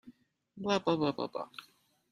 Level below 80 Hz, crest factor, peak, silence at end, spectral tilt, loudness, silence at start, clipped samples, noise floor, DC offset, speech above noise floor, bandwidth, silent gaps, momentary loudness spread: -74 dBFS; 22 dB; -14 dBFS; 0.5 s; -6 dB/octave; -33 LUFS; 0.05 s; under 0.1%; -59 dBFS; under 0.1%; 27 dB; 13.5 kHz; none; 15 LU